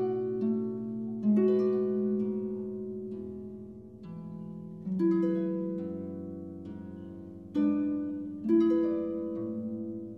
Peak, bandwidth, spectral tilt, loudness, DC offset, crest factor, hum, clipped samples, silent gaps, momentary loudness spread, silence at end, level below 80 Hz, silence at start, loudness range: -16 dBFS; 5.6 kHz; -10.5 dB/octave; -31 LUFS; under 0.1%; 16 dB; none; under 0.1%; none; 17 LU; 0 s; -68 dBFS; 0 s; 4 LU